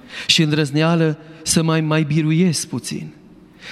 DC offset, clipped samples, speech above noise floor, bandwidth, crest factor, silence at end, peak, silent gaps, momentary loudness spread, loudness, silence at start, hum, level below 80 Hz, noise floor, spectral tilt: under 0.1%; under 0.1%; 25 dB; 13 kHz; 18 dB; 0 s; 0 dBFS; none; 12 LU; -18 LUFS; 0.05 s; none; -52 dBFS; -43 dBFS; -4.5 dB/octave